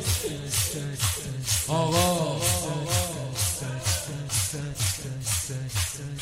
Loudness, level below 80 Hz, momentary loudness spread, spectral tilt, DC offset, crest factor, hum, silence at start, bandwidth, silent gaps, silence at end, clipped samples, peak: -26 LUFS; -46 dBFS; 5 LU; -3.5 dB/octave; under 0.1%; 18 dB; none; 0 s; 16 kHz; none; 0 s; under 0.1%; -8 dBFS